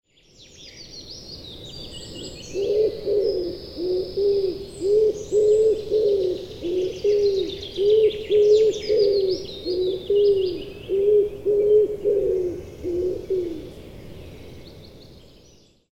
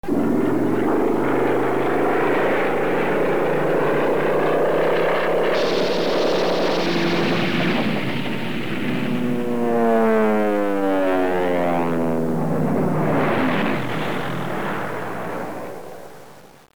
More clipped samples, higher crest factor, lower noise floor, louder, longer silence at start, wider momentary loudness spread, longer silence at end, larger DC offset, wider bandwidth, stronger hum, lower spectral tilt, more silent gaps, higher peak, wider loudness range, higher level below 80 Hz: neither; about the same, 14 dB vs 14 dB; first, -54 dBFS vs -45 dBFS; about the same, -22 LUFS vs -21 LUFS; first, 0.6 s vs 0 s; first, 19 LU vs 7 LU; first, 0.8 s vs 0.05 s; second, 0.2% vs 4%; second, 8.6 kHz vs over 20 kHz; neither; about the same, -5.5 dB/octave vs -6.5 dB/octave; neither; about the same, -8 dBFS vs -6 dBFS; first, 7 LU vs 3 LU; first, -48 dBFS vs -56 dBFS